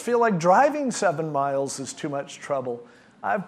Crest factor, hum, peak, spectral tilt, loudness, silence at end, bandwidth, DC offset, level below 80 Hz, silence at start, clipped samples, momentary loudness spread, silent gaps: 18 dB; none; -6 dBFS; -5 dB/octave; -24 LUFS; 0 s; 13.5 kHz; under 0.1%; -74 dBFS; 0 s; under 0.1%; 14 LU; none